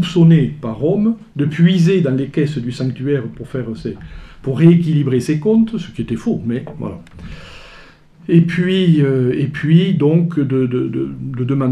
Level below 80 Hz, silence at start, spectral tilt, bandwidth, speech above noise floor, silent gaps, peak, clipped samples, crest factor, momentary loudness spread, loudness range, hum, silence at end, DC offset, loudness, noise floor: -44 dBFS; 0 s; -8.5 dB/octave; 9.8 kHz; 27 dB; none; 0 dBFS; under 0.1%; 16 dB; 16 LU; 4 LU; none; 0 s; under 0.1%; -16 LUFS; -42 dBFS